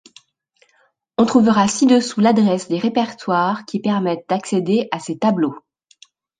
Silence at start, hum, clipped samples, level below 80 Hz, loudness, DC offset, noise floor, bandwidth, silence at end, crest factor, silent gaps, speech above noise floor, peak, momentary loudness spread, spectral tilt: 1.2 s; none; under 0.1%; -62 dBFS; -18 LUFS; under 0.1%; -61 dBFS; 9.6 kHz; 0.8 s; 16 dB; none; 44 dB; -2 dBFS; 8 LU; -5.5 dB/octave